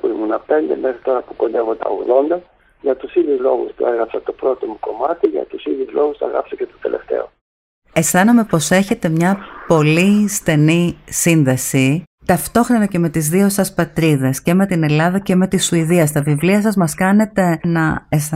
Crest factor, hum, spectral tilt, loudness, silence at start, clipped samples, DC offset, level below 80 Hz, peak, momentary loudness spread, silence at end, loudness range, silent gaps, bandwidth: 14 dB; none; -5.5 dB/octave; -16 LUFS; 0.05 s; under 0.1%; under 0.1%; -46 dBFS; -2 dBFS; 8 LU; 0 s; 5 LU; 7.41-7.82 s, 12.07-12.18 s; 16 kHz